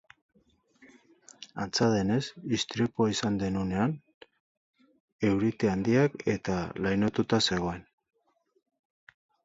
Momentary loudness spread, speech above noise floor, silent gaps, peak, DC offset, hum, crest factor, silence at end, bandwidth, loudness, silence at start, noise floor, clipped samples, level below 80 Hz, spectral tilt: 8 LU; 45 dB; 4.14-4.21 s, 4.40-4.74 s, 5.00-5.19 s; -12 dBFS; under 0.1%; none; 20 dB; 1.6 s; 8 kHz; -28 LUFS; 1.4 s; -73 dBFS; under 0.1%; -56 dBFS; -5.5 dB/octave